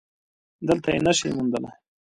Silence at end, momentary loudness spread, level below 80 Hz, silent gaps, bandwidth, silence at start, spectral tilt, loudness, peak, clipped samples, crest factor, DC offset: 0.4 s; 11 LU; -54 dBFS; none; 11.5 kHz; 0.6 s; -4.5 dB/octave; -24 LUFS; -6 dBFS; under 0.1%; 20 dB; under 0.1%